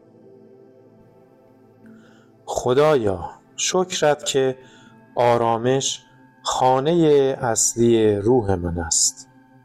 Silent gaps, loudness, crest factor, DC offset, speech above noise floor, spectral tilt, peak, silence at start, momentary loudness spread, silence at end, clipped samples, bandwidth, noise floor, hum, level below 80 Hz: none; -19 LUFS; 14 dB; under 0.1%; 33 dB; -4 dB/octave; -6 dBFS; 2.45 s; 11 LU; 0.4 s; under 0.1%; 15 kHz; -52 dBFS; none; -50 dBFS